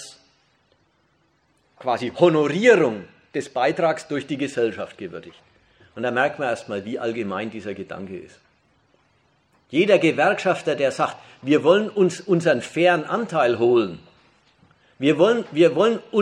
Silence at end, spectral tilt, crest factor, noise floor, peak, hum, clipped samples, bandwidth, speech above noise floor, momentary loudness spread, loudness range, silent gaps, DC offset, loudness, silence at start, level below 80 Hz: 0 s; -5.5 dB/octave; 20 dB; -64 dBFS; -2 dBFS; none; under 0.1%; 10.5 kHz; 44 dB; 16 LU; 7 LU; none; under 0.1%; -21 LUFS; 0 s; -68 dBFS